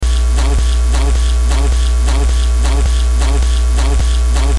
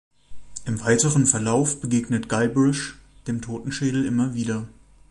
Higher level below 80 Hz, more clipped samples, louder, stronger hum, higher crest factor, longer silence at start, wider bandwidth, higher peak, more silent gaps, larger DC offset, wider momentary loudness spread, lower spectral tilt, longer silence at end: first, -12 dBFS vs -50 dBFS; neither; first, -14 LUFS vs -22 LUFS; neither; second, 6 dB vs 20 dB; second, 0 s vs 0.3 s; about the same, 11.5 kHz vs 11.5 kHz; about the same, -4 dBFS vs -4 dBFS; neither; first, 2% vs under 0.1%; second, 0 LU vs 14 LU; about the same, -5 dB/octave vs -5 dB/octave; second, 0 s vs 0.4 s